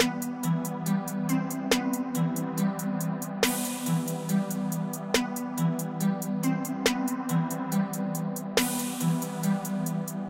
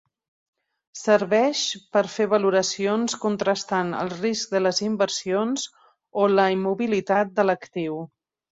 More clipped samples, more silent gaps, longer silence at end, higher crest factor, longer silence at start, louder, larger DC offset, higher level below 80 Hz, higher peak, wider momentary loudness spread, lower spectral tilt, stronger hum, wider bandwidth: neither; neither; second, 0 s vs 0.5 s; about the same, 18 dB vs 18 dB; second, 0 s vs 0.95 s; second, -29 LUFS vs -23 LUFS; neither; first, -62 dBFS vs -68 dBFS; second, -10 dBFS vs -4 dBFS; second, 4 LU vs 10 LU; about the same, -5 dB/octave vs -4 dB/octave; neither; first, 17 kHz vs 8 kHz